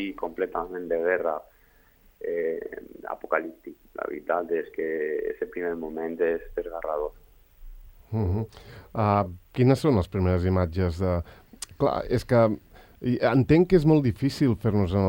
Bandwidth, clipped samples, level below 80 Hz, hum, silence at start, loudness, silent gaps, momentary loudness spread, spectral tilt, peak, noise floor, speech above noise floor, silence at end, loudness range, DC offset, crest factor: 16.5 kHz; under 0.1%; -48 dBFS; none; 0 s; -26 LUFS; none; 15 LU; -8 dB/octave; -6 dBFS; -59 dBFS; 34 dB; 0 s; 8 LU; under 0.1%; 20 dB